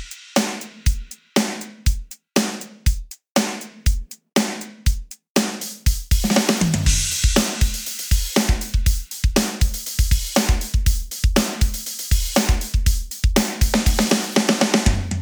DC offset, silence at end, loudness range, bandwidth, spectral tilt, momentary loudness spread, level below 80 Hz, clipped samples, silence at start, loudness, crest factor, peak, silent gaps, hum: under 0.1%; 0 s; 4 LU; over 20 kHz; -4 dB/octave; 7 LU; -22 dBFS; under 0.1%; 0 s; -21 LUFS; 18 dB; 0 dBFS; 3.30-3.35 s, 5.30-5.35 s; none